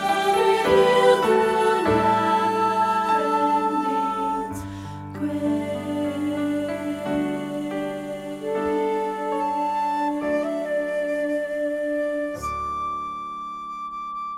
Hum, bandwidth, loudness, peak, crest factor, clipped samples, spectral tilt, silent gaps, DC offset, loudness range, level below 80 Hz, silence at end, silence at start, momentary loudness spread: none; 16 kHz; -23 LUFS; -6 dBFS; 18 dB; under 0.1%; -5.5 dB/octave; none; under 0.1%; 8 LU; -52 dBFS; 0 s; 0 s; 13 LU